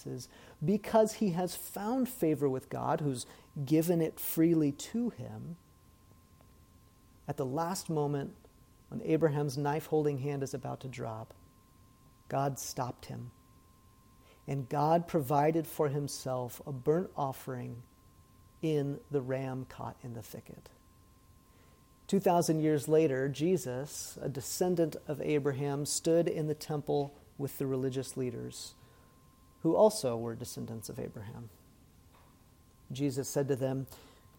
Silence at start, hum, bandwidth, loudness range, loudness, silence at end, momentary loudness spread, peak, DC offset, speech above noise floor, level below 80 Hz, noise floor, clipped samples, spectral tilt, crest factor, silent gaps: 0 s; none; 17.5 kHz; 8 LU; -33 LUFS; 0.3 s; 17 LU; -14 dBFS; under 0.1%; 29 dB; -64 dBFS; -62 dBFS; under 0.1%; -6 dB/octave; 20 dB; none